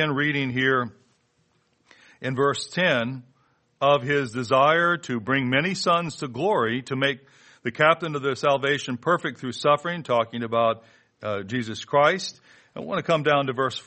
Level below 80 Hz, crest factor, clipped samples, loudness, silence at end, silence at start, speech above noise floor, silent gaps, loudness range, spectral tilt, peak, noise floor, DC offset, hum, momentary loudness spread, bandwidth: -66 dBFS; 22 dB; under 0.1%; -23 LUFS; 0.05 s; 0 s; 44 dB; none; 3 LU; -5 dB/octave; -4 dBFS; -67 dBFS; under 0.1%; none; 11 LU; 8.8 kHz